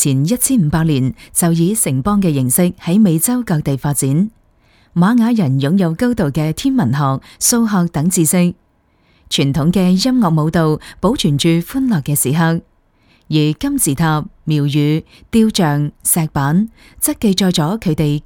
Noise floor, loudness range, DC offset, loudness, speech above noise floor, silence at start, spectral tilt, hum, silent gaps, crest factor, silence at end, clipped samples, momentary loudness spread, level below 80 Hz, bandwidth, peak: -56 dBFS; 2 LU; under 0.1%; -15 LUFS; 42 dB; 0 s; -5 dB/octave; none; none; 14 dB; 0.05 s; under 0.1%; 5 LU; -40 dBFS; 19.5 kHz; -2 dBFS